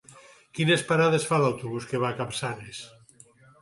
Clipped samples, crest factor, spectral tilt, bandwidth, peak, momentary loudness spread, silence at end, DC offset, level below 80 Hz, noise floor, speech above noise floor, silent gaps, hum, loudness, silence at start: under 0.1%; 18 dB; -5 dB/octave; 11.5 kHz; -10 dBFS; 18 LU; 0.75 s; under 0.1%; -64 dBFS; -55 dBFS; 30 dB; none; none; -25 LUFS; 0.15 s